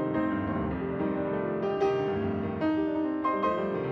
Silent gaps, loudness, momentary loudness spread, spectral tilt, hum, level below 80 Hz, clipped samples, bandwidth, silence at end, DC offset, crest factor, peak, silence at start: none; -29 LUFS; 3 LU; -8.5 dB/octave; none; -52 dBFS; under 0.1%; 6.2 kHz; 0 s; under 0.1%; 14 dB; -16 dBFS; 0 s